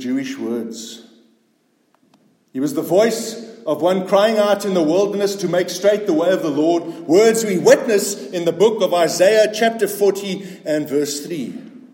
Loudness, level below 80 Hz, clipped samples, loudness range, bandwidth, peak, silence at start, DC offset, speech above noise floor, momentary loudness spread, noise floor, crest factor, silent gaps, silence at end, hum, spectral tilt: -17 LUFS; -70 dBFS; under 0.1%; 7 LU; 17 kHz; 0 dBFS; 0 s; under 0.1%; 45 dB; 13 LU; -62 dBFS; 18 dB; none; 0.15 s; none; -4.5 dB/octave